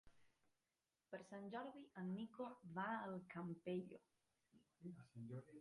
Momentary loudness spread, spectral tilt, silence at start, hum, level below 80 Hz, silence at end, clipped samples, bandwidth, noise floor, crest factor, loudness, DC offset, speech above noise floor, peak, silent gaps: 12 LU; -7.5 dB/octave; 0.05 s; none; -88 dBFS; 0 s; under 0.1%; 11 kHz; under -90 dBFS; 18 dB; -52 LUFS; under 0.1%; over 38 dB; -36 dBFS; none